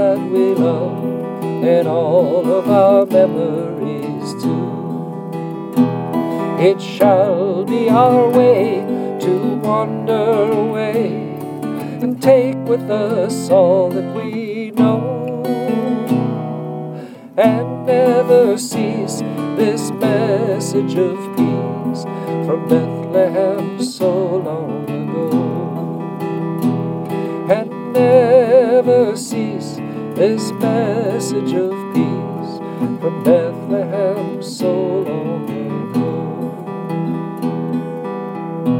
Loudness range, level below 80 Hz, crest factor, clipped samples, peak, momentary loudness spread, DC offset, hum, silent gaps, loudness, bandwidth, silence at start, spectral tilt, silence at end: 6 LU; -68 dBFS; 16 dB; under 0.1%; 0 dBFS; 12 LU; under 0.1%; none; none; -17 LUFS; 17 kHz; 0 s; -7 dB/octave; 0 s